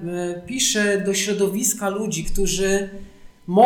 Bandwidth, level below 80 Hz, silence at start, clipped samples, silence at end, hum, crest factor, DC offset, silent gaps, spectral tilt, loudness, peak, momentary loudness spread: 19 kHz; -34 dBFS; 0 s; under 0.1%; 0 s; none; 16 dB; under 0.1%; none; -3 dB/octave; -21 LUFS; -4 dBFS; 9 LU